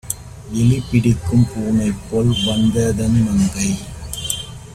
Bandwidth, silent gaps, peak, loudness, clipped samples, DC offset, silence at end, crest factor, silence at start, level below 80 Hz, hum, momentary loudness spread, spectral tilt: 15.5 kHz; none; -2 dBFS; -18 LUFS; under 0.1%; under 0.1%; 0 s; 16 dB; 0.05 s; -34 dBFS; none; 10 LU; -5.5 dB/octave